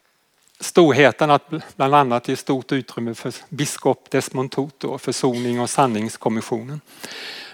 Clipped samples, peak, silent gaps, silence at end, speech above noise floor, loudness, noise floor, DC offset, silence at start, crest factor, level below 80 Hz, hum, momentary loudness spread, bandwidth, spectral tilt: under 0.1%; -2 dBFS; none; 0 s; 41 dB; -20 LUFS; -61 dBFS; under 0.1%; 0.6 s; 20 dB; -72 dBFS; none; 16 LU; 18 kHz; -5 dB/octave